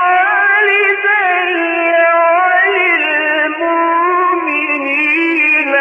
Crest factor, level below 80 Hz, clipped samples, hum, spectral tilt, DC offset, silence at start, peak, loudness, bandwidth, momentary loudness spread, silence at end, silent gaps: 10 dB; -64 dBFS; under 0.1%; none; -3.5 dB/octave; under 0.1%; 0 s; -2 dBFS; -11 LUFS; 5.6 kHz; 4 LU; 0 s; none